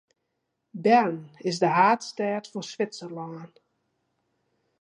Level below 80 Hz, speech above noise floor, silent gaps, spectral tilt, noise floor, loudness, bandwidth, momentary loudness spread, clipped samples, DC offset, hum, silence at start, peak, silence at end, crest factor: -80 dBFS; 54 dB; none; -5 dB/octave; -79 dBFS; -25 LUFS; 11 kHz; 17 LU; under 0.1%; under 0.1%; none; 0.75 s; -6 dBFS; 1.35 s; 22 dB